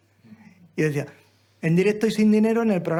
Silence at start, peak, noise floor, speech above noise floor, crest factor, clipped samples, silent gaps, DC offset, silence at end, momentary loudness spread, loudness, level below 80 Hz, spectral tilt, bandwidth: 0.75 s; -10 dBFS; -50 dBFS; 30 dB; 14 dB; under 0.1%; none; under 0.1%; 0 s; 13 LU; -22 LUFS; -66 dBFS; -7 dB/octave; 13 kHz